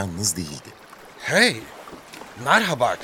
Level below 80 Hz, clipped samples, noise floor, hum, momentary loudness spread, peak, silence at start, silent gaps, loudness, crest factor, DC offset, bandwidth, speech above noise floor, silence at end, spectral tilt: -56 dBFS; under 0.1%; -43 dBFS; none; 22 LU; -2 dBFS; 0 s; none; -20 LUFS; 22 dB; under 0.1%; 17 kHz; 22 dB; 0 s; -2.5 dB/octave